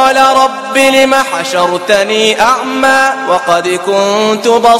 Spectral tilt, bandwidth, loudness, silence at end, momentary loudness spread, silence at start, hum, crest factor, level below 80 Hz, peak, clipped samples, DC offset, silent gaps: -2.5 dB/octave; 16.5 kHz; -9 LUFS; 0 s; 5 LU; 0 s; none; 10 dB; -48 dBFS; 0 dBFS; 0.6%; under 0.1%; none